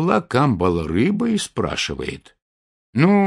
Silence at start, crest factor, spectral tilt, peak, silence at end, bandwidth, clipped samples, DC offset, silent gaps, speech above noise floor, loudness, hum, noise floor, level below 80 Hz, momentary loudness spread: 0 s; 18 dB; -6 dB/octave; -2 dBFS; 0 s; 11.5 kHz; under 0.1%; under 0.1%; 2.42-2.93 s; over 71 dB; -20 LUFS; none; under -90 dBFS; -46 dBFS; 11 LU